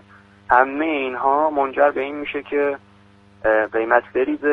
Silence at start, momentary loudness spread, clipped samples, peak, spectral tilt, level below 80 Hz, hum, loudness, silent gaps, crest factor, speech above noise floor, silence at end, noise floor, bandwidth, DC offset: 0.5 s; 8 LU; under 0.1%; 0 dBFS; -7 dB/octave; -54 dBFS; none; -20 LUFS; none; 20 dB; 32 dB; 0 s; -51 dBFS; 4.8 kHz; under 0.1%